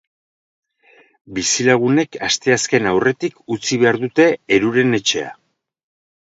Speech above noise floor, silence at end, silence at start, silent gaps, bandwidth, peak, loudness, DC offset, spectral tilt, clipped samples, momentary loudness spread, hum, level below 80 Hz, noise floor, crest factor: 36 dB; 0.9 s; 1.3 s; none; 8 kHz; 0 dBFS; -16 LUFS; under 0.1%; -3.5 dB/octave; under 0.1%; 9 LU; none; -56 dBFS; -53 dBFS; 18 dB